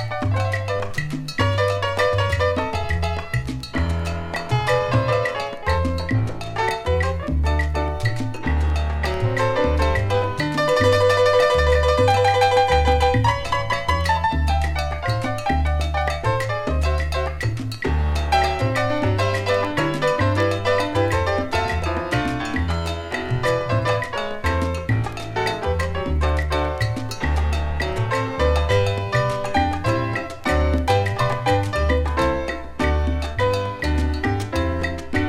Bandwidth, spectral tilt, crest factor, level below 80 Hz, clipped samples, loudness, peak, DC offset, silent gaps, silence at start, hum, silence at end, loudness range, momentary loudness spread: 13.5 kHz; -6 dB/octave; 16 dB; -28 dBFS; under 0.1%; -21 LUFS; -4 dBFS; under 0.1%; none; 0 s; none; 0 s; 5 LU; 7 LU